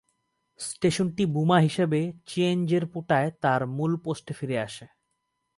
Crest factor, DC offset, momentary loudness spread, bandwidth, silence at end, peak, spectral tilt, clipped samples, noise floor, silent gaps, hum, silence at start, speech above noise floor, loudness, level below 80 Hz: 20 dB; under 0.1%; 12 LU; 11.5 kHz; 0.7 s; -8 dBFS; -6 dB/octave; under 0.1%; -78 dBFS; none; none; 0.6 s; 52 dB; -26 LUFS; -64 dBFS